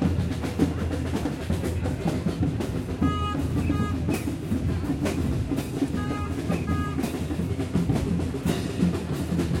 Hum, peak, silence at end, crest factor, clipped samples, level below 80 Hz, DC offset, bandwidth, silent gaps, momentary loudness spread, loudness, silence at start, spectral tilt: none; -8 dBFS; 0 s; 18 dB; under 0.1%; -40 dBFS; under 0.1%; 16.5 kHz; none; 3 LU; -27 LUFS; 0 s; -7 dB/octave